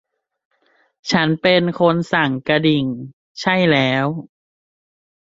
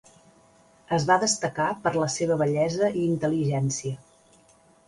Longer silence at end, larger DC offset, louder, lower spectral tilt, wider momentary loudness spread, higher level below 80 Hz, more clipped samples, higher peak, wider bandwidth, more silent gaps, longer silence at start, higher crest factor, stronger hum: about the same, 0.95 s vs 0.9 s; neither; first, -17 LUFS vs -25 LUFS; about the same, -6 dB/octave vs -5 dB/octave; first, 14 LU vs 7 LU; about the same, -58 dBFS vs -60 dBFS; neither; first, -2 dBFS vs -8 dBFS; second, 7.8 kHz vs 11.5 kHz; first, 3.13-3.35 s vs none; first, 1.05 s vs 0.9 s; about the same, 18 dB vs 20 dB; neither